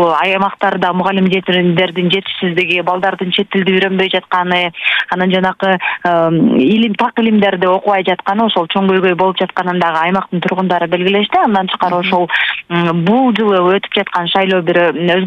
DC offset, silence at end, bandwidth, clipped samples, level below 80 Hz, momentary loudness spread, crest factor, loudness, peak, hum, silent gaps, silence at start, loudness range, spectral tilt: under 0.1%; 0 s; 7 kHz; under 0.1%; -56 dBFS; 3 LU; 12 dB; -13 LUFS; 0 dBFS; none; none; 0 s; 1 LU; -7.5 dB/octave